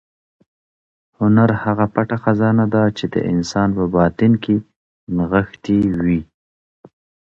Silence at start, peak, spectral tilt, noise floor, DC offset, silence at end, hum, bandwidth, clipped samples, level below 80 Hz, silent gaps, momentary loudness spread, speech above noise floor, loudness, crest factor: 1.2 s; 0 dBFS; -8 dB/octave; under -90 dBFS; under 0.1%; 1.15 s; none; 7.6 kHz; under 0.1%; -42 dBFS; 4.76-5.07 s; 6 LU; over 74 dB; -17 LUFS; 18 dB